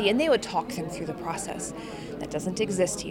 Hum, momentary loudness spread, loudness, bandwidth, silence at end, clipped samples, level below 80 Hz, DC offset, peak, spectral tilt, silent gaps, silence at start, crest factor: none; 12 LU; -29 LUFS; 17 kHz; 0 s; under 0.1%; -54 dBFS; under 0.1%; -8 dBFS; -4 dB/octave; none; 0 s; 20 dB